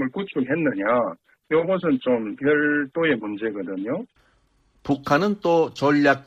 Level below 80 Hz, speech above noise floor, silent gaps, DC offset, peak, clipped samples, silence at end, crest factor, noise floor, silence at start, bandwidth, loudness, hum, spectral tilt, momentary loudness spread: -60 dBFS; 41 dB; none; under 0.1%; -6 dBFS; under 0.1%; 0.05 s; 16 dB; -63 dBFS; 0 s; 7.8 kHz; -22 LUFS; none; -7 dB/octave; 9 LU